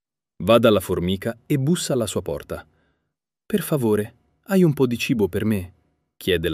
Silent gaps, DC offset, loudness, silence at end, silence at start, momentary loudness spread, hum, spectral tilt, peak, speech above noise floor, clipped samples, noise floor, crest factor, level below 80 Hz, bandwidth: none; under 0.1%; -22 LUFS; 0 s; 0.4 s; 13 LU; none; -6 dB/octave; -2 dBFS; 59 dB; under 0.1%; -80 dBFS; 20 dB; -50 dBFS; 16 kHz